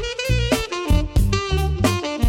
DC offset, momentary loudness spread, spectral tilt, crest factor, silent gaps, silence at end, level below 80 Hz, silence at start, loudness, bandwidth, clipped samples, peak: under 0.1%; 2 LU; -5 dB/octave; 12 dB; none; 0 s; -24 dBFS; 0 s; -21 LUFS; 17 kHz; under 0.1%; -6 dBFS